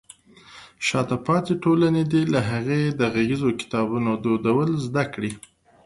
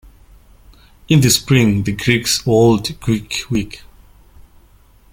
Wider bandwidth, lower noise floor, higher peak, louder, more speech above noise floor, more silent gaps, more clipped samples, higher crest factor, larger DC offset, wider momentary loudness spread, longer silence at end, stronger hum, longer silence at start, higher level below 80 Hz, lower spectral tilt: second, 11.5 kHz vs 17 kHz; about the same, -49 dBFS vs -48 dBFS; second, -6 dBFS vs 0 dBFS; second, -23 LUFS vs -15 LUFS; second, 27 dB vs 34 dB; neither; neither; about the same, 16 dB vs 16 dB; neither; second, 6 LU vs 10 LU; second, 0.45 s vs 1.35 s; neither; second, 0.5 s vs 1.1 s; second, -54 dBFS vs -40 dBFS; first, -6.5 dB/octave vs -4.5 dB/octave